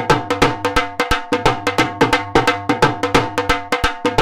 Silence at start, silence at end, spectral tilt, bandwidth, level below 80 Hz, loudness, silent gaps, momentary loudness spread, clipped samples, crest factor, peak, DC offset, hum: 0 s; 0 s; -4.5 dB/octave; 17 kHz; -32 dBFS; -17 LUFS; none; 4 LU; under 0.1%; 16 dB; -2 dBFS; under 0.1%; none